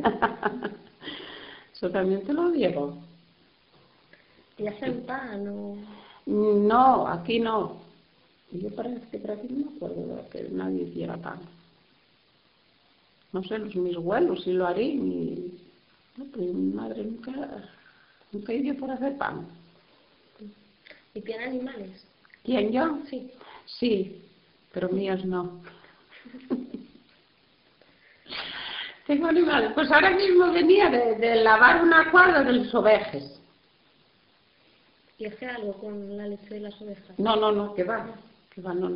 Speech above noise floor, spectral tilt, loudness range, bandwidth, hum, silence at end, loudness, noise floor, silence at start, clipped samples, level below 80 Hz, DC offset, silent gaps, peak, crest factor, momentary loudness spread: 39 dB; -3 dB/octave; 18 LU; 5.4 kHz; none; 0 s; -25 LUFS; -64 dBFS; 0 s; under 0.1%; -62 dBFS; under 0.1%; none; -4 dBFS; 24 dB; 22 LU